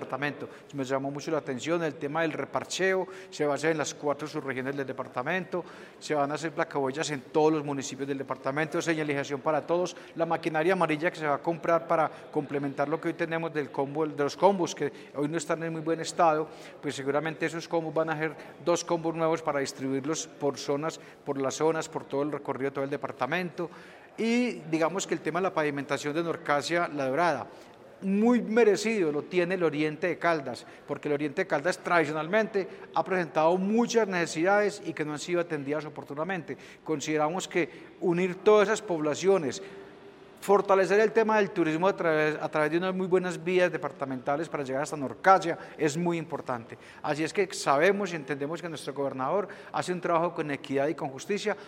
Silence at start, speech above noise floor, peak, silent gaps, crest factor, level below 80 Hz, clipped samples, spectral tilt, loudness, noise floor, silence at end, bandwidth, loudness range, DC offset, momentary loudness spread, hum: 0 s; 22 dB; -6 dBFS; none; 22 dB; -74 dBFS; under 0.1%; -5 dB/octave; -29 LUFS; -50 dBFS; 0 s; 15.5 kHz; 5 LU; under 0.1%; 10 LU; none